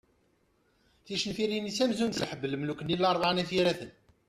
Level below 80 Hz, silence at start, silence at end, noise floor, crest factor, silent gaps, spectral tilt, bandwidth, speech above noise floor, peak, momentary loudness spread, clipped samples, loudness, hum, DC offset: -64 dBFS; 1.05 s; 0.4 s; -70 dBFS; 16 dB; none; -4.5 dB/octave; 14 kHz; 40 dB; -14 dBFS; 7 LU; under 0.1%; -30 LUFS; none; under 0.1%